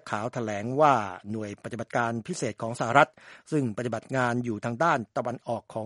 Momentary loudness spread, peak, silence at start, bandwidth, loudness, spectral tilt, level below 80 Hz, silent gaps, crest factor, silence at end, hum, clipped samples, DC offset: 12 LU; -4 dBFS; 0.05 s; 11.5 kHz; -28 LUFS; -5.5 dB/octave; -68 dBFS; none; 24 dB; 0 s; none; under 0.1%; under 0.1%